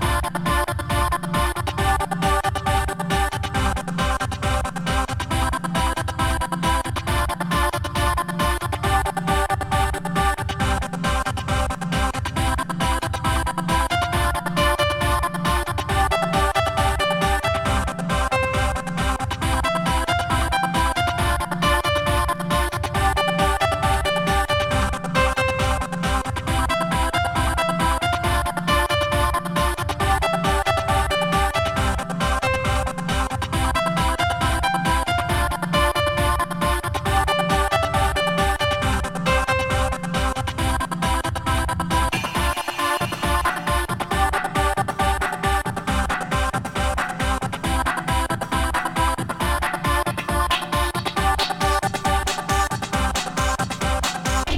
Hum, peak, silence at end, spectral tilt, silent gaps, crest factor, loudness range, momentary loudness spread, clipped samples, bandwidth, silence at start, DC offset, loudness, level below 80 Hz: none; -6 dBFS; 0 s; -4.5 dB/octave; none; 16 dB; 2 LU; 4 LU; under 0.1%; 16.5 kHz; 0 s; under 0.1%; -22 LUFS; -28 dBFS